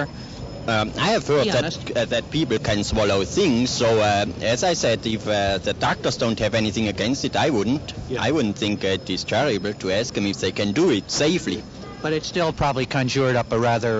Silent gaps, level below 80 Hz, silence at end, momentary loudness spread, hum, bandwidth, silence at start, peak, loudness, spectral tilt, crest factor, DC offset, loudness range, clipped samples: none; -44 dBFS; 0 s; 6 LU; none; 8 kHz; 0 s; -8 dBFS; -22 LUFS; -4.5 dB/octave; 14 dB; under 0.1%; 2 LU; under 0.1%